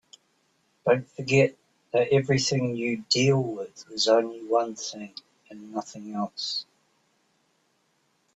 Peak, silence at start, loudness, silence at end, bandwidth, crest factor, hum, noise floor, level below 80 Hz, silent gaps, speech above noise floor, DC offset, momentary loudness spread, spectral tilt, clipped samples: -8 dBFS; 0.85 s; -26 LUFS; 1.7 s; 8.4 kHz; 20 dB; none; -70 dBFS; -66 dBFS; none; 45 dB; under 0.1%; 14 LU; -4.5 dB/octave; under 0.1%